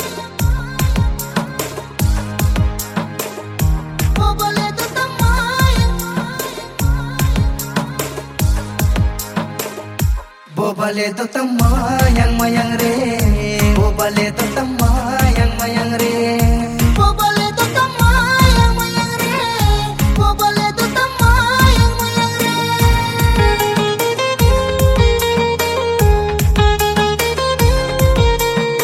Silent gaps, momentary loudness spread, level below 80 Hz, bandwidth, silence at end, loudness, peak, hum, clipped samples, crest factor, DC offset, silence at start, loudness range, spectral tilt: none; 8 LU; -20 dBFS; 16.5 kHz; 0 s; -16 LUFS; 0 dBFS; none; under 0.1%; 14 dB; under 0.1%; 0 s; 5 LU; -5 dB/octave